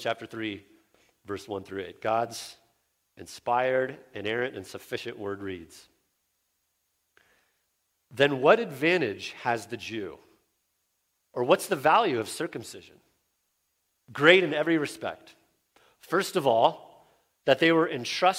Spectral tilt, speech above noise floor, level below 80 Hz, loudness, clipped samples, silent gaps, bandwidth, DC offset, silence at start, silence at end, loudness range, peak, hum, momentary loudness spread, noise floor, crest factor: -4.5 dB/octave; 50 dB; -72 dBFS; -26 LUFS; under 0.1%; none; 16.5 kHz; under 0.1%; 0 s; 0 s; 10 LU; -4 dBFS; none; 18 LU; -76 dBFS; 26 dB